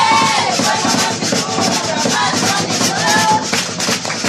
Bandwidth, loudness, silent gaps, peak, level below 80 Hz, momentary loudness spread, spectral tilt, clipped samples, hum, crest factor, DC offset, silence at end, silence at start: 15.5 kHz; -14 LUFS; none; -2 dBFS; -54 dBFS; 4 LU; -2 dB/octave; under 0.1%; none; 14 dB; under 0.1%; 0 s; 0 s